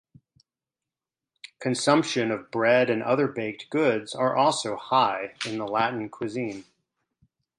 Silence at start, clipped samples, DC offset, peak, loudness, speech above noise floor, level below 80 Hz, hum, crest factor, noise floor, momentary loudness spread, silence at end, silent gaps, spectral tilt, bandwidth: 1.6 s; under 0.1%; under 0.1%; -4 dBFS; -25 LUFS; 65 dB; -72 dBFS; none; 22 dB; -90 dBFS; 10 LU; 0.95 s; none; -4.5 dB/octave; 11 kHz